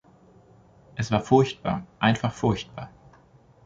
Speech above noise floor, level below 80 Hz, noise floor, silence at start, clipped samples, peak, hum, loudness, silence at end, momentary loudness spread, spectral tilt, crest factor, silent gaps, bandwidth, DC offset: 32 dB; -52 dBFS; -55 dBFS; 0.95 s; under 0.1%; -6 dBFS; none; -25 LUFS; 0.8 s; 19 LU; -6.5 dB/octave; 22 dB; none; 7.8 kHz; under 0.1%